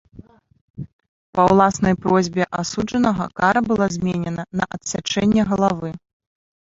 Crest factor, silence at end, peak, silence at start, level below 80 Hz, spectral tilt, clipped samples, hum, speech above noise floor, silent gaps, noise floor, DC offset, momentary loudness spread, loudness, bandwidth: 18 dB; 0.7 s; -2 dBFS; 0.15 s; -46 dBFS; -5.5 dB/octave; under 0.1%; none; 27 dB; 0.61-0.74 s, 0.93-0.99 s, 1.08-1.33 s; -45 dBFS; under 0.1%; 15 LU; -19 LUFS; 8 kHz